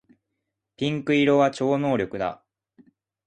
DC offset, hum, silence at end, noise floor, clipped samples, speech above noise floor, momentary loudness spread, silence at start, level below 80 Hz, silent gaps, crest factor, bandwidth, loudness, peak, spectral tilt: under 0.1%; none; 0.95 s; -81 dBFS; under 0.1%; 59 dB; 10 LU; 0.8 s; -62 dBFS; none; 18 dB; 9.4 kHz; -23 LUFS; -8 dBFS; -6.5 dB/octave